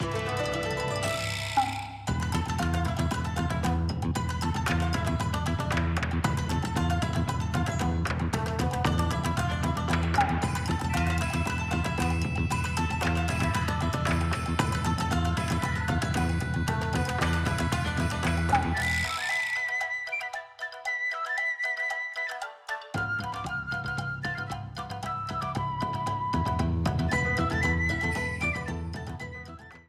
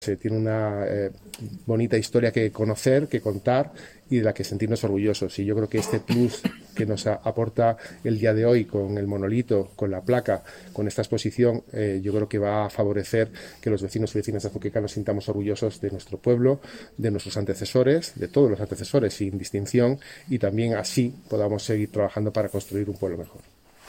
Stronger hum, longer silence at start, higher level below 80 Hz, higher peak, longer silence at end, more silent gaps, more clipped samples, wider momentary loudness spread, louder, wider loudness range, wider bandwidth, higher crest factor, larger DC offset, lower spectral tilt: neither; about the same, 0 s vs 0 s; first, -38 dBFS vs -56 dBFS; second, -12 dBFS vs -8 dBFS; second, 0.05 s vs 0.5 s; neither; neither; about the same, 6 LU vs 8 LU; second, -29 LUFS vs -25 LUFS; about the same, 3 LU vs 2 LU; about the same, 15 kHz vs 16.5 kHz; about the same, 18 dB vs 18 dB; neither; about the same, -5.5 dB/octave vs -6.5 dB/octave